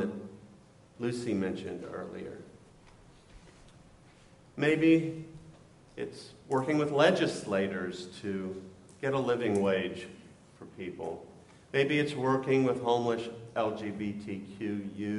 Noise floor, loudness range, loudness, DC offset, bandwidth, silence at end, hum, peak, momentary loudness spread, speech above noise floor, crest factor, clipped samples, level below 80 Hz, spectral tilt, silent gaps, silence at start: -58 dBFS; 9 LU; -31 LUFS; under 0.1%; 11.5 kHz; 0 s; none; -12 dBFS; 20 LU; 27 dB; 22 dB; under 0.1%; -66 dBFS; -6 dB/octave; none; 0 s